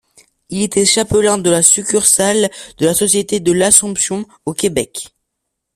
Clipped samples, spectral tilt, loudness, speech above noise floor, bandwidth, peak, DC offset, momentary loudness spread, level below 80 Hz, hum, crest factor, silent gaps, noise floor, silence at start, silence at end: under 0.1%; -2.5 dB/octave; -13 LUFS; 61 dB; 16 kHz; 0 dBFS; under 0.1%; 14 LU; -46 dBFS; none; 16 dB; none; -75 dBFS; 0.5 s; 0.7 s